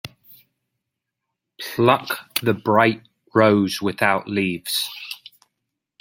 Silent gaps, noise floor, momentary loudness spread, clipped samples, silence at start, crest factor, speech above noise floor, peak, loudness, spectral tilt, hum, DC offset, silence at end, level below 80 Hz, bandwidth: none; -81 dBFS; 17 LU; under 0.1%; 0.05 s; 22 dB; 62 dB; -2 dBFS; -20 LUFS; -5 dB/octave; none; under 0.1%; 0.85 s; -64 dBFS; 16.5 kHz